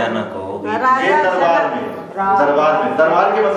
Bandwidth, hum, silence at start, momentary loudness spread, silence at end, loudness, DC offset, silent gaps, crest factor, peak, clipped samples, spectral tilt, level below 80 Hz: 9.6 kHz; none; 0 s; 11 LU; 0 s; -15 LUFS; under 0.1%; none; 14 dB; -2 dBFS; under 0.1%; -5.5 dB/octave; -60 dBFS